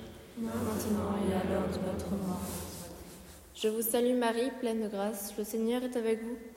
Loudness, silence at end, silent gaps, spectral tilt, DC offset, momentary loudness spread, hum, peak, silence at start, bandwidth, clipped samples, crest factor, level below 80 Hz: -33 LUFS; 0 s; none; -5 dB/octave; under 0.1%; 15 LU; none; -18 dBFS; 0 s; 16 kHz; under 0.1%; 16 dB; -56 dBFS